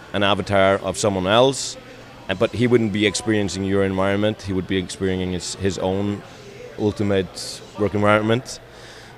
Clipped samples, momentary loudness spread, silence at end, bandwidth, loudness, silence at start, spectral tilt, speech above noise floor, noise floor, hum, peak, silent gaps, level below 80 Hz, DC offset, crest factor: under 0.1%; 18 LU; 0 s; 14.5 kHz; -21 LUFS; 0 s; -5 dB/octave; 21 dB; -41 dBFS; none; -2 dBFS; none; -50 dBFS; under 0.1%; 20 dB